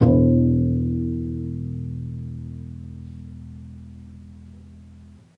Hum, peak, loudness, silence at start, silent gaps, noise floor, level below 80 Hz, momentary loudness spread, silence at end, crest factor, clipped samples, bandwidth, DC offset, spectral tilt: none; -4 dBFS; -23 LUFS; 0 s; none; -46 dBFS; -38 dBFS; 26 LU; 0.3 s; 20 dB; under 0.1%; 2.8 kHz; under 0.1%; -12 dB/octave